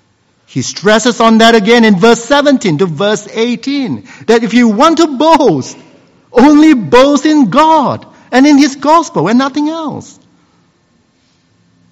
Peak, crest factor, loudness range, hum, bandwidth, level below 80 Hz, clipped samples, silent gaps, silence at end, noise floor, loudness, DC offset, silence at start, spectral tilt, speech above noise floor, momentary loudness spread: 0 dBFS; 10 dB; 4 LU; none; 10.5 kHz; -46 dBFS; 2%; none; 1.9 s; -53 dBFS; -8 LUFS; under 0.1%; 0.55 s; -4.5 dB/octave; 45 dB; 12 LU